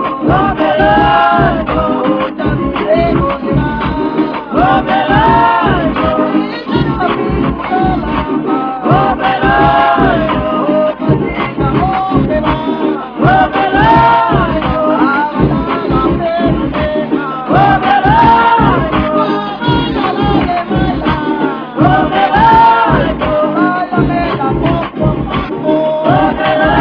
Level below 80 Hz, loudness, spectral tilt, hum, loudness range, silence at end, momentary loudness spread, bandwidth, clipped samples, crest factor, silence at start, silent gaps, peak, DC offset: -26 dBFS; -11 LUFS; -9 dB/octave; none; 3 LU; 0 s; 7 LU; 5.4 kHz; 0.2%; 10 dB; 0 s; none; 0 dBFS; under 0.1%